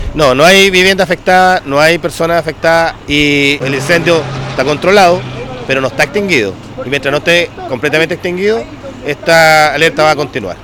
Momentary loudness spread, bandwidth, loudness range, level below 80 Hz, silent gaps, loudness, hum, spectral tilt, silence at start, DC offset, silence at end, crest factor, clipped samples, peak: 12 LU; 19.5 kHz; 4 LU; -34 dBFS; none; -10 LUFS; none; -4 dB/octave; 0 s; under 0.1%; 0 s; 10 dB; 0.3%; 0 dBFS